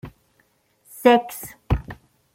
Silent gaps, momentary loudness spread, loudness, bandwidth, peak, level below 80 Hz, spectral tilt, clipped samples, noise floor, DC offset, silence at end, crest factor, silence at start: none; 23 LU; -20 LUFS; 16.5 kHz; -2 dBFS; -38 dBFS; -6 dB/octave; under 0.1%; -64 dBFS; under 0.1%; 0.4 s; 22 dB; 0.05 s